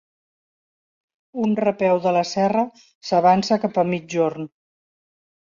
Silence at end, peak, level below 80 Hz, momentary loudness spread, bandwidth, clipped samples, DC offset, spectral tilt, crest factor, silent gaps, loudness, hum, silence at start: 0.95 s; -4 dBFS; -64 dBFS; 15 LU; 7.6 kHz; under 0.1%; under 0.1%; -6 dB/octave; 18 dB; 2.95-3.01 s; -20 LUFS; none; 1.35 s